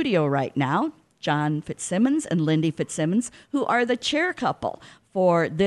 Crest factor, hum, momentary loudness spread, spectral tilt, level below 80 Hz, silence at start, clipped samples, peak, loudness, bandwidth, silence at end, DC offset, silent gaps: 16 dB; none; 9 LU; -5.5 dB/octave; -60 dBFS; 0 s; under 0.1%; -8 dBFS; -24 LUFS; 12 kHz; 0 s; under 0.1%; none